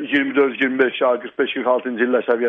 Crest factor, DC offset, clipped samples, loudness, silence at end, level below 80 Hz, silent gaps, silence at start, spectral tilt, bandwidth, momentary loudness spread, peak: 16 dB; under 0.1%; under 0.1%; -19 LUFS; 0 s; -70 dBFS; none; 0 s; -6.5 dB/octave; 4.2 kHz; 4 LU; -4 dBFS